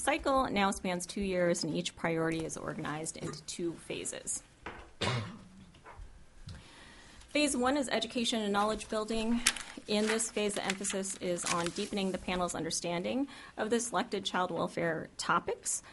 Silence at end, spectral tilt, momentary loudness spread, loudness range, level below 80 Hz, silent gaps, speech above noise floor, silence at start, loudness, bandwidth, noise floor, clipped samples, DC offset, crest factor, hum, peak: 0 s; -3.5 dB/octave; 16 LU; 7 LU; -56 dBFS; none; 21 dB; 0 s; -33 LUFS; 11.5 kHz; -54 dBFS; under 0.1%; under 0.1%; 28 dB; none; -8 dBFS